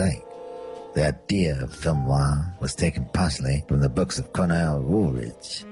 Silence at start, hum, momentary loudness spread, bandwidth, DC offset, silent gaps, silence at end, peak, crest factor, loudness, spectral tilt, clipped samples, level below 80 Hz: 0 s; none; 11 LU; 11.5 kHz; under 0.1%; none; 0 s; -10 dBFS; 14 dB; -25 LUFS; -6 dB/octave; under 0.1%; -36 dBFS